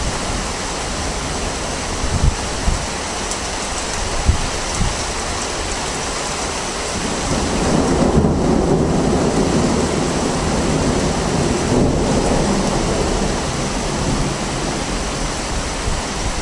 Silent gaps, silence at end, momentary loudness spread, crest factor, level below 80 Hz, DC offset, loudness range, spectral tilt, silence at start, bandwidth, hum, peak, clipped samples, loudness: none; 0 s; 6 LU; 18 dB; -26 dBFS; under 0.1%; 4 LU; -4.5 dB/octave; 0 s; 11.5 kHz; none; 0 dBFS; under 0.1%; -19 LUFS